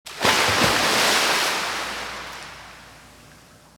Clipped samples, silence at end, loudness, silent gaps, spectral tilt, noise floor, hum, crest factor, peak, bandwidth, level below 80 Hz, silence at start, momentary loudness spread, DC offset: under 0.1%; 0.75 s; -19 LUFS; none; -1.5 dB/octave; -49 dBFS; none; 20 dB; -4 dBFS; over 20 kHz; -50 dBFS; 0.05 s; 19 LU; under 0.1%